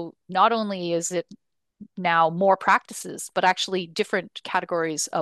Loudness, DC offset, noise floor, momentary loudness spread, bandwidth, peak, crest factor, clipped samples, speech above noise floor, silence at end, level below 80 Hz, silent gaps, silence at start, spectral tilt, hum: -23 LUFS; under 0.1%; -49 dBFS; 9 LU; 12.5 kHz; -6 dBFS; 18 dB; under 0.1%; 25 dB; 0 s; -74 dBFS; none; 0 s; -3.5 dB/octave; none